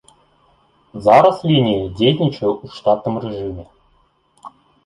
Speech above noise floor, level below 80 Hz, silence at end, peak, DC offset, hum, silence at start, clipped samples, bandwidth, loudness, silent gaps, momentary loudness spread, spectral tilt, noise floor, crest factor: 43 dB; -48 dBFS; 0.35 s; -2 dBFS; under 0.1%; none; 0.95 s; under 0.1%; 11 kHz; -16 LUFS; none; 16 LU; -7.5 dB/octave; -59 dBFS; 18 dB